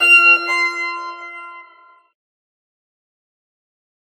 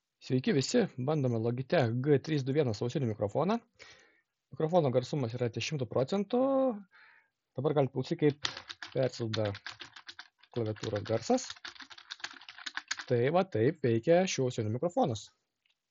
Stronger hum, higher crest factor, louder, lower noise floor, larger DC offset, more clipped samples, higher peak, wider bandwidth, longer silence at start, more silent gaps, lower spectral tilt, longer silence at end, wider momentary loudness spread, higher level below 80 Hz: neither; about the same, 18 dB vs 22 dB; first, -12 LUFS vs -32 LUFS; second, -49 dBFS vs -79 dBFS; neither; neither; first, -2 dBFS vs -10 dBFS; first, over 20 kHz vs 7.6 kHz; second, 0 s vs 0.25 s; neither; second, 2 dB/octave vs -5.5 dB/octave; first, 2.55 s vs 0.65 s; first, 25 LU vs 15 LU; second, -90 dBFS vs -74 dBFS